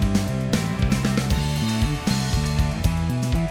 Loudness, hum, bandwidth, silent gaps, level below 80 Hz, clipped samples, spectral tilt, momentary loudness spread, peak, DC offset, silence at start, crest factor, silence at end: -23 LUFS; none; 20 kHz; none; -28 dBFS; under 0.1%; -5.5 dB/octave; 2 LU; -6 dBFS; under 0.1%; 0 s; 16 dB; 0 s